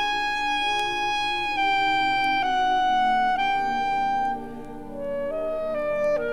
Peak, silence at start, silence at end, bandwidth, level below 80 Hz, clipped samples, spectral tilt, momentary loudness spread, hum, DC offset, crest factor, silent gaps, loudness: -12 dBFS; 0 s; 0 s; 13 kHz; -46 dBFS; under 0.1%; -3 dB/octave; 9 LU; 60 Hz at -55 dBFS; under 0.1%; 12 dB; none; -24 LUFS